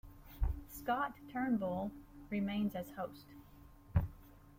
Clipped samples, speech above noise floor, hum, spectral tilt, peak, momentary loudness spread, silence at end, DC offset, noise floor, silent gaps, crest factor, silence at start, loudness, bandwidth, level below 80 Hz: under 0.1%; 20 dB; none; -7.5 dB/octave; -20 dBFS; 20 LU; 0 s; under 0.1%; -59 dBFS; none; 20 dB; 0.05 s; -40 LUFS; 16.5 kHz; -48 dBFS